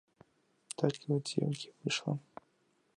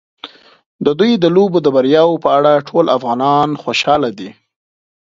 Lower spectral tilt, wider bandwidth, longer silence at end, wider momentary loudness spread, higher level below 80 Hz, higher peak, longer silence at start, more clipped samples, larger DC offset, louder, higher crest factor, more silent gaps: about the same, -5 dB/octave vs -6 dB/octave; first, 11.5 kHz vs 7.6 kHz; about the same, 0.8 s vs 0.75 s; second, 14 LU vs 20 LU; second, -78 dBFS vs -58 dBFS; second, -14 dBFS vs 0 dBFS; first, 0.8 s vs 0.25 s; neither; neither; second, -36 LUFS vs -13 LUFS; first, 24 dB vs 14 dB; second, none vs 0.66-0.79 s